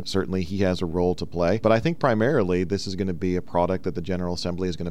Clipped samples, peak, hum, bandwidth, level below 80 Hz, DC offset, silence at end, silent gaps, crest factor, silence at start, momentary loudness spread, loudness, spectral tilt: under 0.1%; -6 dBFS; none; 13 kHz; -46 dBFS; 2%; 0 s; none; 16 dB; 0 s; 7 LU; -24 LUFS; -6.5 dB/octave